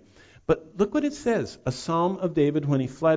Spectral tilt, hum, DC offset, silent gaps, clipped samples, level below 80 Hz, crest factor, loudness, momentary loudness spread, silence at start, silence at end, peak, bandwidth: -7 dB/octave; none; under 0.1%; none; under 0.1%; -52 dBFS; 16 dB; -26 LUFS; 5 LU; 0.5 s; 0 s; -10 dBFS; 8 kHz